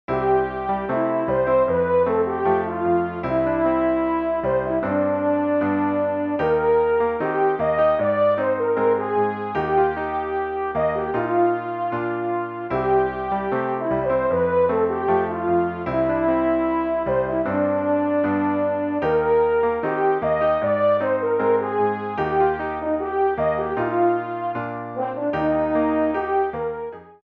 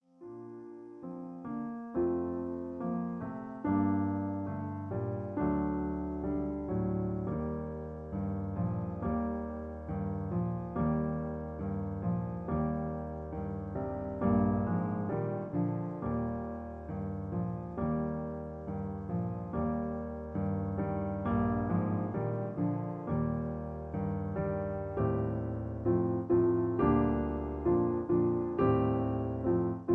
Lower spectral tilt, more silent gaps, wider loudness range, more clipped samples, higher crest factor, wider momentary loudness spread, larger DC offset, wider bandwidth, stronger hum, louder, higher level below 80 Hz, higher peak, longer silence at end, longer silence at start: second, -10 dB/octave vs -12 dB/octave; neither; second, 3 LU vs 6 LU; neither; about the same, 12 dB vs 16 dB; second, 6 LU vs 10 LU; neither; first, 5.4 kHz vs 3.5 kHz; neither; first, -21 LUFS vs -34 LUFS; about the same, -48 dBFS vs -48 dBFS; first, -8 dBFS vs -16 dBFS; about the same, 0.1 s vs 0 s; about the same, 0.1 s vs 0.2 s